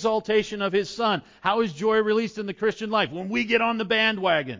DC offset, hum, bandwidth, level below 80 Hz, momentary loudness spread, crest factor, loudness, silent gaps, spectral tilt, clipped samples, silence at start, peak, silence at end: under 0.1%; none; 7.6 kHz; -62 dBFS; 6 LU; 18 dB; -24 LUFS; none; -5 dB/octave; under 0.1%; 0 s; -6 dBFS; 0 s